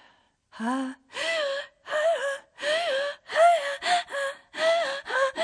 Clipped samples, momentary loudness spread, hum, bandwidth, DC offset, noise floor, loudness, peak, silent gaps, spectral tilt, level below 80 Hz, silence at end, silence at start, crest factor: under 0.1%; 11 LU; none; 10.5 kHz; under 0.1%; -62 dBFS; -26 LUFS; -8 dBFS; none; -1.5 dB/octave; -76 dBFS; 0 s; 0.55 s; 18 dB